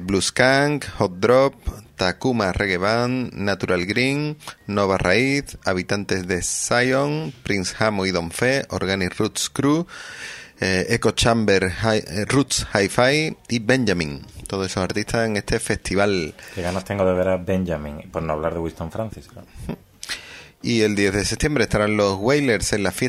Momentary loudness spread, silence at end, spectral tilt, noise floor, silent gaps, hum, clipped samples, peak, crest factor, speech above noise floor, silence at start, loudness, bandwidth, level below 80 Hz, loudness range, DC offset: 13 LU; 0 s; -4.5 dB/octave; -40 dBFS; none; none; under 0.1%; 0 dBFS; 22 dB; 19 dB; 0 s; -21 LUFS; 16 kHz; -42 dBFS; 5 LU; under 0.1%